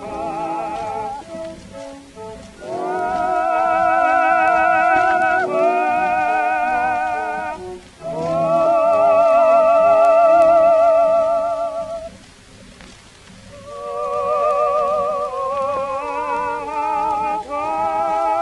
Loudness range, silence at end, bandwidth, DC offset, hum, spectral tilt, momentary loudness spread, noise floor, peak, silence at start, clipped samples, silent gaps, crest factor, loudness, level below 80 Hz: 10 LU; 0 s; 11 kHz; under 0.1%; none; -5 dB/octave; 19 LU; -43 dBFS; -4 dBFS; 0 s; under 0.1%; none; 14 dB; -17 LUFS; -50 dBFS